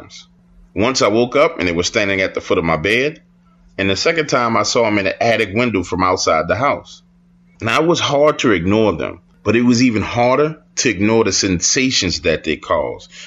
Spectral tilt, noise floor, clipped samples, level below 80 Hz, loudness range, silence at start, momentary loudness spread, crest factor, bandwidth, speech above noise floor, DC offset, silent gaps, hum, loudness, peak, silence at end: -4 dB/octave; -51 dBFS; under 0.1%; -44 dBFS; 2 LU; 0 s; 6 LU; 14 dB; 11 kHz; 35 dB; under 0.1%; none; none; -16 LUFS; -2 dBFS; 0 s